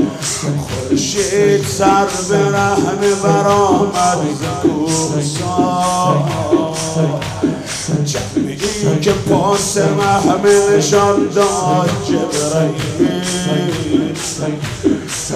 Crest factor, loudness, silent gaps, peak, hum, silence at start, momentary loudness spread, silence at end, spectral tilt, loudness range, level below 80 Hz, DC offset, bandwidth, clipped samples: 12 dB; -15 LUFS; none; -2 dBFS; none; 0 s; 7 LU; 0 s; -5 dB/octave; 4 LU; -42 dBFS; under 0.1%; 15.5 kHz; under 0.1%